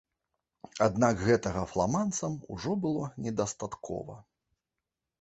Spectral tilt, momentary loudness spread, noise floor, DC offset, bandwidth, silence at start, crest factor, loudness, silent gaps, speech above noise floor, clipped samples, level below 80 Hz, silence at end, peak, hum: -5.5 dB/octave; 13 LU; -88 dBFS; under 0.1%; 8.4 kHz; 0.75 s; 22 dB; -31 LUFS; none; 58 dB; under 0.1%; -54 dBFS; 1 s; -10 dBFS; none